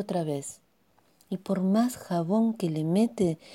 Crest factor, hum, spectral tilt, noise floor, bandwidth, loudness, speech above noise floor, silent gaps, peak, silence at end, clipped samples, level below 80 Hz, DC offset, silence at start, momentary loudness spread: 16 dB; none; -7 dB/octave; -66 dBFS; 16.5 kHz; -28 LUFS; 39 dB; none; -12 dBFS; 0 s; under 0.1%; -66 dBFS; under 0.1%; 0 s; 11 LU